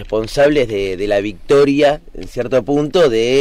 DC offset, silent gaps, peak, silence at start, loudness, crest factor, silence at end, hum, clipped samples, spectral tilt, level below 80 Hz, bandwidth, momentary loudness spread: under 0.1%; none; -4 dBFS; 0 s; -15 LUFS; 10 dB; 0 s; none; under 0.1%; -5.5 dB/octave; -34 dBFS; 13.5 kHz; 7 LU